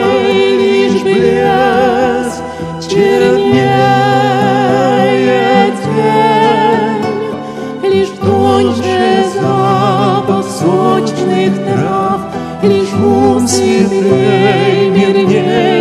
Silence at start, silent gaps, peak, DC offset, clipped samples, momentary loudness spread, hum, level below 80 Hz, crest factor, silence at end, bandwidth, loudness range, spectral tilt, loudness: 0 s; none; 0 dBFS; under 0.1%; under 0.1%; 6 LU; none; -46 dBFS; 10 dB; 0 s; 13.5 kHz; 2 LU; -6 dB/octave; -11 LUFS